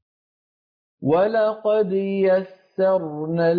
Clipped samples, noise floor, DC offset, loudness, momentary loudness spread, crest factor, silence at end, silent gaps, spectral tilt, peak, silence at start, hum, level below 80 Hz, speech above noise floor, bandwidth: under 0.1%; under -90 dBFS; under 0.1%; -21 LUFS; 6 LU; 12 dB; 0 s; none; -10 dB/octave; -8 dBFS; 1 s; none; -68 dBFS; over 70 dB; 5.2 kHz